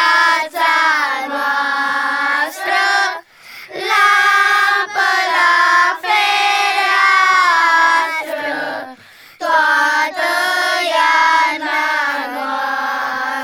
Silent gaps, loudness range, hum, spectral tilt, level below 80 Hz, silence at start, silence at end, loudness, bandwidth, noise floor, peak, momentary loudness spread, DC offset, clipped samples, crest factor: none; 4 LU; none; 0.5 dB/octave; -70 dBFS; 0 s; 0 s; -14 LUFS; 18 kHz; -41 dBFS; -2 dBFS; 10 LU; under 0.1%; under 0.1%; 14 dB